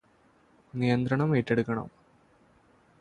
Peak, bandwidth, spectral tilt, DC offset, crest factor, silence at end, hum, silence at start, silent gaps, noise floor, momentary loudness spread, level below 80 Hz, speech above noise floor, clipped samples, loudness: -12 dBFS; 10 kHz; -8.5 dB/octave; under 0.1%; 20 dB; 1.1 s; none; 0.75 s; none; -63 dBFS; 13 LU; -62 dBFS; 37 dB; under 0.1%; -28 LUFS